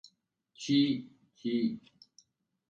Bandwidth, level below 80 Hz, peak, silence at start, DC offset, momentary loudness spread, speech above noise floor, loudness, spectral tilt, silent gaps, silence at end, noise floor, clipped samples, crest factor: 7.8 kHz; -76 dBFS; -18 dBFS; 0.6 s; under 0.1%; 15 LU; 44 dB; -32 LUFS; -5.5 dB/octave; none; 0.9 s; -74 dBFS; under 0.1%; 18 dB